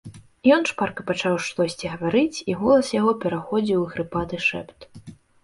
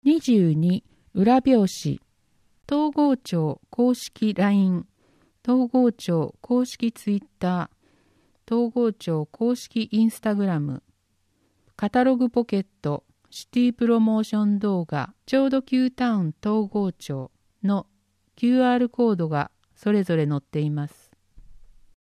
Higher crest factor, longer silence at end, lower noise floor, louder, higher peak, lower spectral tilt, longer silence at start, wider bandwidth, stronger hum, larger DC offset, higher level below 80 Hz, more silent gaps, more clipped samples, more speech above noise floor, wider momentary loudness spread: about the same, 18 dB vs 16 dB; second, 0.3 s vs 0.45 s; second, -44 dBFS vs -69 dBFS; about the same, -22 LUFS vs -23 LUFS; first, -4 dBFS vs -8 dBFS; second, -5.5 dB/octave vs -7 dB/octave; about the same, 0.05 s vs 0.05 s; second, 11.5 kHz vs 13.5 kHz; neither; neither; first, -54 dBFS vs -60 dBFS; neither; neither; second, 22 dB vs 47 dB; about the same, 9 LU vs 11 LU